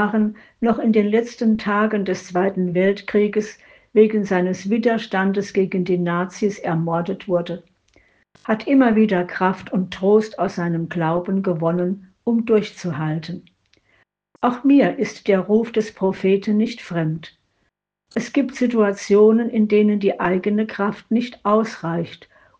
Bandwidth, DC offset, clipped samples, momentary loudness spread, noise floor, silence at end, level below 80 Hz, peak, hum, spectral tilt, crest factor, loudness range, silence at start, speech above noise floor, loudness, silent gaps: 7.8 kHz; under 0.1%; under 0.1%; 9 LU; -71 dBFS; 0.45 s; -60 dBFS; -2 dBFS; none; -7 dB/octave; 18 dB; 4 LU; 0 s; 52 dB; -20 LUFS; none